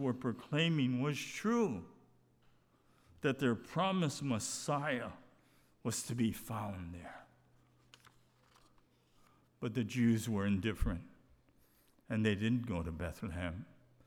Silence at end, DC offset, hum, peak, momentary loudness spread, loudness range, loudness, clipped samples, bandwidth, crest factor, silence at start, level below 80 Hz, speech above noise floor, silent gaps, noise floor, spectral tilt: 0.45 s; under 0.1%; none; -20 dBFS; 13 LU; 6 LU; -37 LUFS; under 0.1%; 18 kHz; 18 dB; 0 s; -54 dBFS; 34 dB; none; -70 dBFS; -5.5 dB/octave